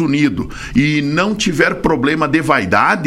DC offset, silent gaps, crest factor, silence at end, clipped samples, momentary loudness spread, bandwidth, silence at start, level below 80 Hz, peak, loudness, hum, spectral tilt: under 0.1%; none; 14 dB; 0 s; under 0.1%; 4 LU; 14.5 kHz; 0 s; -36 dBFS; 0 dBFS; -15 LUFS; none; -5.5 dB/octave